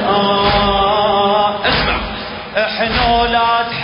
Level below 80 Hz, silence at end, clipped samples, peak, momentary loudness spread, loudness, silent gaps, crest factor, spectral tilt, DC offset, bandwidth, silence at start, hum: -30 dBFS; 0 s; under 0.1%; -2 dBFS; 7 LU; -14 LUFS; none; 14 dB; -9 dB/octave; under 0.1%; 5.4 kHz; 0 s; none